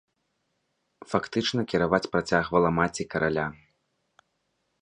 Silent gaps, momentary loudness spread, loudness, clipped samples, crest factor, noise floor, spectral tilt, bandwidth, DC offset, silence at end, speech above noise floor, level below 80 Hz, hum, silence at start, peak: none; 7 LU; -26 LUFS; under 0.1%; 24 dB; -76 dBFS; -5.5 dB/octave; 10.5 kHz; under 0.1%; 1.3 s; 51 dB; -54 dBFS; none; 1.1 s; -6 dBFS